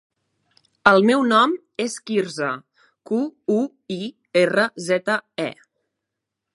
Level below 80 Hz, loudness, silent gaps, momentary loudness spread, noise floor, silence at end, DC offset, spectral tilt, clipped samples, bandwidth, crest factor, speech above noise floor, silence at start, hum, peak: -66 dBFS; -21 LUFS; none; 13 LU; -82 dBFS; 1 s; under 0.1%; -4.5 dB/octave; under 0.1%; 11.5 kHz; 22 dB; 62 dB; 0.85 s; none; 0 dBFS